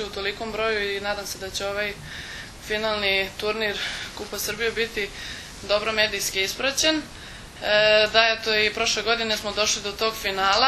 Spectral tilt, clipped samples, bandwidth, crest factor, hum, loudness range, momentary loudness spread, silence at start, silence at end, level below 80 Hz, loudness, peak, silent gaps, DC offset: -1.5 dB/octave; under 0.1%; 13.5 kHz; 24 dB; none; 6 LU; 15 LU; 0 s; 0 s; -48 dBFS; -23 LUFS; 0 dBFS; none; under 0.1%